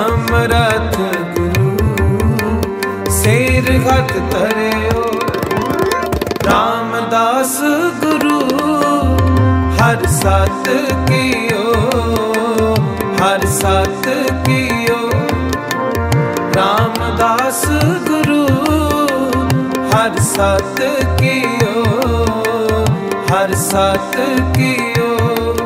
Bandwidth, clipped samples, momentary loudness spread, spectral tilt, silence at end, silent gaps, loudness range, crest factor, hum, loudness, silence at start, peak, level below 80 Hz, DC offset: 16.5 kHz; under 0.1%; 4 LU; -5.5 dB/octave; 0 s; none; 2 LU; 14 dB; none; -14 LUFS; 0 s; 0 dBFS; -28 dBFS; under 0.1%